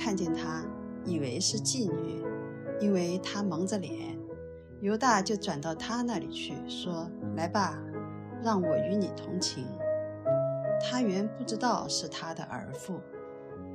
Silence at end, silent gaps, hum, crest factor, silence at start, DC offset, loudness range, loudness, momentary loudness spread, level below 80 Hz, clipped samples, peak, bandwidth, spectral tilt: 0 s; none; none; 20 dB; 0 s; under 0.1%; 2 LU; -32 LUFS; 11 LU; -64 dBFS; under 0.1%; -12 dBFS; 15 kHz; -4.5 dB/octave